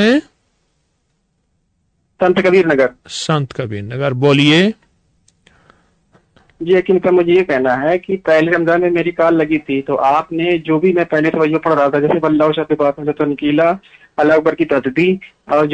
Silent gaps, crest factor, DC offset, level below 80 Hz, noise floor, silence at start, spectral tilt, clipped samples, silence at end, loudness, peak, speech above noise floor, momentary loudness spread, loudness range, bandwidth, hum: none; 12 dB; under 0.1%; -52 dBFS; -65 dBFS; 0 s; -6.5 dB/octave; under 0.1%; 0 s; -14 LUFS; -2 dBFS; 51 dB; 7 LU; 3 LU; 9.4 kHz; none